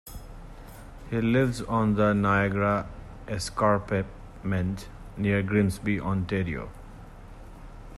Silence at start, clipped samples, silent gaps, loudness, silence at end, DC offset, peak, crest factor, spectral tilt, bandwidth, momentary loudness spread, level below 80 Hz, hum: 0.05 s; under 0.1%; none; -27 LUFS; 0 s; under 0.1%; -10 dBFS; 16 dB; -7 dB/octave; 13.5 kHz; 24 LU; -44 dBFS; none